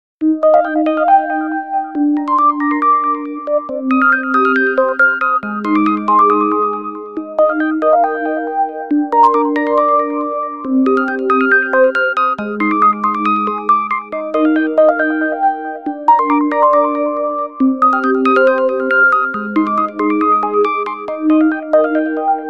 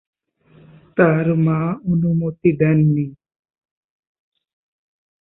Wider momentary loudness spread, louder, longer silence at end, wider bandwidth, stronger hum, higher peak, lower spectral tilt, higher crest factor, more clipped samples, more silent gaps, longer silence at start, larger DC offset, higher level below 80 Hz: about the same, 7 LU vs 7 LU; first, -14 LUFS vs -18 LUFS; second, 0 s vs 2.1 s; first, 6 kHz vs 3.1 kHz; neither; about the same, 0 dBFS vs -2 dBFS; second, -7.5 dB/octave vs -14 dB/octave; about the same, 14 dB vs 18 dB; neither; neither; second, 0.2 s vs 0.95 s; first, 0.2% vs under 0.1%; second, -64 dBFS vs -54 dBFS